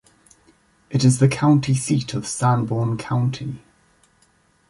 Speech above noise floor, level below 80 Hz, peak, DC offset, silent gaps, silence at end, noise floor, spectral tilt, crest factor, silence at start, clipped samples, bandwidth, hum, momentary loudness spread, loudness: 41 dB; -54 dBFS; -4 dBFS; under 0.1%; none; 1.15 s; -60 dBFS; -6 dB/octave; 16 dB; 0.9 s; under 0.1%; 11.5 kHz; none; 11 LU; -20 LUFS